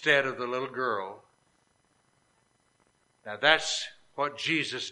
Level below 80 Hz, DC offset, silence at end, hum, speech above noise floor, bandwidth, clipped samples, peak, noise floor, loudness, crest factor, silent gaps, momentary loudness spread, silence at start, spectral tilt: -74 dBFS; under 0.1%; 0 s; none; 41 dB; 11 kHz; under 0.1%; -4 dBFS; -70 dBFS; -28 LUFS; 26 dB; none; 17 LU; 0 s; -2.5 dB/octave